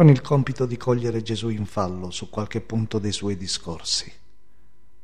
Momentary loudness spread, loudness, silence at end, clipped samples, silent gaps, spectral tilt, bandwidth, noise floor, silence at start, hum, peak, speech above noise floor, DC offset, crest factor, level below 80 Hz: 7 LU; -25 LUFS; 0.95 s; under 0.1%; none; -6 dB/octave; 10.5 kHz; -60 dBFS; 0 s; none; -4 dBFS; 38 dB; 1%; 20 dB; -50 dBFS